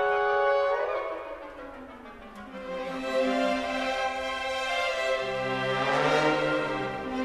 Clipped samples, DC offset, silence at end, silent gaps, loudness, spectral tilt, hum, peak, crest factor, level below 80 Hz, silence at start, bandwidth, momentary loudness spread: under 0.1%; under 0.1%; 0 s; none; -28 LUFS; -4.5 dB/octave; none; -10 dBFS; 18 dB; -56 dBFS; 0 s; 13.5 kHz; 18 LU